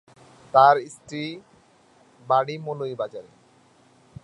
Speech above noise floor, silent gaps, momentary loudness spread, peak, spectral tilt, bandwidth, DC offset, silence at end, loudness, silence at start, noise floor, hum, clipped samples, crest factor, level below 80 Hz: 35 dB; none; 19 LU; -2 dBFS; -5.5 dB/octave; 11.5 kHz; under 0.1%; 1.05 s; -22 LUFS; 0.55 s; -57 dBFS; none; under 0.1%; 22 dB; -68 dBFS